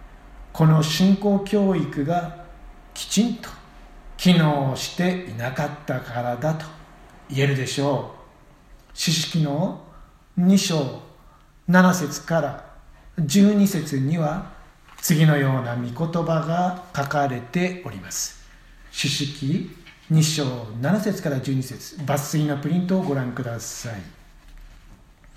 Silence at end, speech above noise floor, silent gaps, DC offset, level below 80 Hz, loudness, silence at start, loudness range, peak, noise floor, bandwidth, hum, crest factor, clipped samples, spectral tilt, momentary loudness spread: 0.45 s; 29 dB; none; under 0.1%; -50 dBFS; -22 LUFS; 0 s; 5 LU; -4 dBFS; -51 dBFS; 15.5 kHz; none; 20 dB; under 0.1%; -5.5 dB/octave; 16 LU